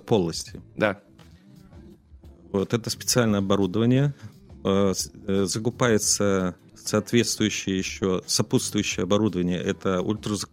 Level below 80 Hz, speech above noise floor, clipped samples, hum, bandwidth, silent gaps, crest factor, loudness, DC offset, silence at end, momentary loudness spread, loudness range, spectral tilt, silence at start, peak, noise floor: -54 dBFS; 26 dB; under 0.1%; none; 16 kHz; none; 20 dB; -24 LUFS; under 0.1%; 0.05 s; 8 LU; 3 LU; -4.5 dB/octave; 0.05 s; -6 dBFS; -50 dBFS